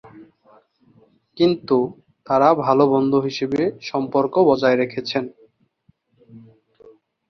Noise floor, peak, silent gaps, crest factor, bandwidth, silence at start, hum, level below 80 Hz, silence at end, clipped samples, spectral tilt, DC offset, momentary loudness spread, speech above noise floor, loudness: -62 dBFS; -2 dBFS; none; 20 dB; 6.6 kHz; 0.05 s; none; -62 dBFS; 0.9 s; under 0.1%; -7 dB/octave; under 0.1%; 10 LU; 44 dB; -19 LUFS